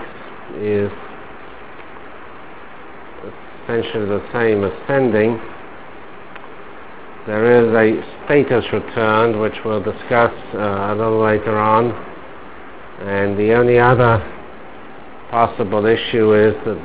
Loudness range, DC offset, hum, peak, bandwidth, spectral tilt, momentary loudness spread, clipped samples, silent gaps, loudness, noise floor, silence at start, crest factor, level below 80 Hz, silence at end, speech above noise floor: 11 LU; 2%; none; 0 dBFS; 4 kHz; -10.5 dB/octave; 24 LU; under 0.1%; none; -16 LUFS; -37 dBFS; 0 s; 18 dB; -44 dBFS; 0 s; 22 dB